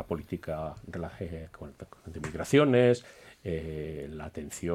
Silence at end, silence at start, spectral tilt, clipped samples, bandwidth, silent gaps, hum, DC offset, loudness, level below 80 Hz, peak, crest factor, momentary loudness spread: 0 s; 0 s; -6.5 dB/octave; under 0.1%; 15.5 kHz; none; none; under 0.1%; -30 LUFS; -52 dBFS; -10 dBFS; 20 dB; 22 LU